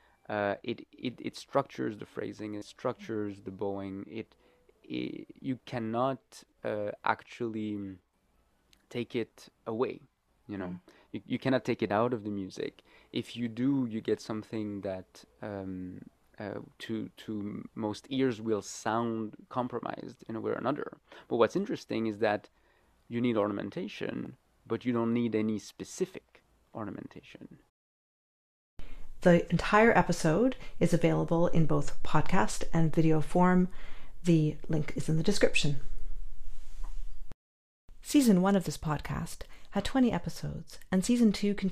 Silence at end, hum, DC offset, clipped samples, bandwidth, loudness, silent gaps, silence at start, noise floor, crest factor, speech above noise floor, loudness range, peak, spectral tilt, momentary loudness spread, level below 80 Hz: 0 s; none; under 0.1%; under 0.1%; 15 kHz; -32 LUFS; 27.69-28.77 s, 37.34-37.88 s; 0.3 s; -71 dBFS; 22 dB; 41 dB; 11 LU; -8 dBFS; -6 dB/octave; 18 LU; -46 dBFS